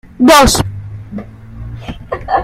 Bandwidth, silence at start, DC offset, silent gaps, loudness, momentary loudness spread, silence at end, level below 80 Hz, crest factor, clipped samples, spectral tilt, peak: 16.5 kHz; 0.2 s; under 0.1%; none; -9 LUFS; 23 LU; 0 s; -28 dBFS; 14 dB; 0.1%; -4 dB/octave; 0 dBFS